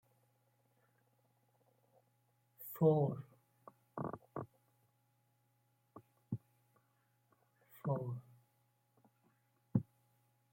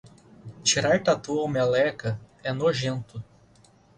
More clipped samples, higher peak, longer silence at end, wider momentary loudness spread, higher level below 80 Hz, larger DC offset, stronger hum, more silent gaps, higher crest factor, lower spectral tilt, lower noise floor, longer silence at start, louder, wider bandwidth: neither; second, -20 dBFS vs -8 dBFS; about the same, 0.7 s vs 0.75 s; first, 21 LU vs 12 LU; second, -82 dBFS vs -58 dBFS; neither; neither; neither; first, 26 dB vs 18 dB; first, -10 dB/octave vs -4 dB/octave; first, -78 dBFS vs -57 dBFS; first, 2.6 s vs 0.05 s; second, -40 LUFS vs -25 LUFS; first, 16.5 kHz vs 10.5 kHz